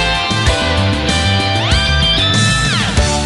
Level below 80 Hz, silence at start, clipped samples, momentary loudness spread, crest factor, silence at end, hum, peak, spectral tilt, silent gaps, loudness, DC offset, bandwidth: -20 dBFS; 0 s; under 0.1%; 3 LU; 12 dB; 0 s; none; 0 dBFS; -4 dB/octave; none; -13 LUFS; under 0.1%; 12 kHz